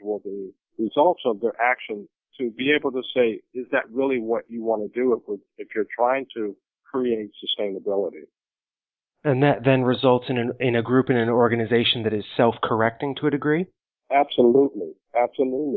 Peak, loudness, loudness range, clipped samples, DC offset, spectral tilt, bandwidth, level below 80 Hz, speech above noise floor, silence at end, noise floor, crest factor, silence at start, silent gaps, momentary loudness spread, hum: -4 dBFS; -23 LUFS; 6 LU; under 0.1%; under 0.1%; -10.5 dB/octave; 4.6 kHz; -64 dBFS; over 68 dB; 0 s; under -90 dBFS; 20 dB; 0 s; none; 12 LU; none